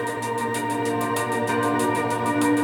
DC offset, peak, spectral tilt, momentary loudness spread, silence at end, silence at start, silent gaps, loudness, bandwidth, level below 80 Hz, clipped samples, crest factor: under 0.1%; -10 dBFS; -5 dB/octave; 4 LU; 0 s; 0 s; none; -24 LUFS; 17.5 kHz; -64 dBFS; under 0.1%; 14 dB